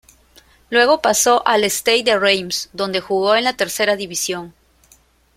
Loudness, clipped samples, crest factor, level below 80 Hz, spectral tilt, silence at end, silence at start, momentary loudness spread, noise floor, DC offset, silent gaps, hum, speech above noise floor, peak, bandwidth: -16 LUFS; under 0.1%; 18 dB; -56 dBFS; -1.5 dB/octave; 0.85 s; 0.7 s; 8 LU; -54 dBFS; under 0.1%; none; none; 37 dB; -2 dBFS; 16.5 kHz